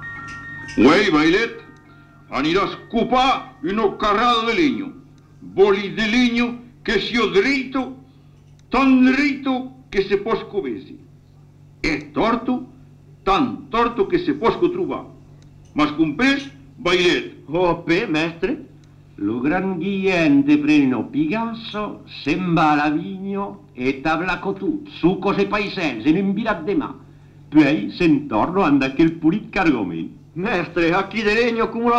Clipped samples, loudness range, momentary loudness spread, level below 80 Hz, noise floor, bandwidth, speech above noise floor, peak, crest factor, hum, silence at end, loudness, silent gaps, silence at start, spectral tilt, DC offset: under 0.1%; 3 LU; 11 LU; -44 dBFS; -47 dBFS; 9 kHz; 28 dB; -4 dBFS; 16 dB; none; 0 s; -19 LUFS; none; 0 s; -6 dB/octave; under 0.1%